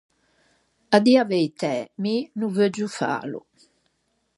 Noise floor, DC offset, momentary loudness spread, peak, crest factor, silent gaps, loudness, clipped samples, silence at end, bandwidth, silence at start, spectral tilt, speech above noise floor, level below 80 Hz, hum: -71 dBFS; under 0.1%; 11 LU; -2 dBFS; 22 dB; none; -22 LUFS; under 0.1%; 1 s; 11.5 kHz; 0.9 s; -5.5 dB/octave; 49 dB; -74 dBFS; none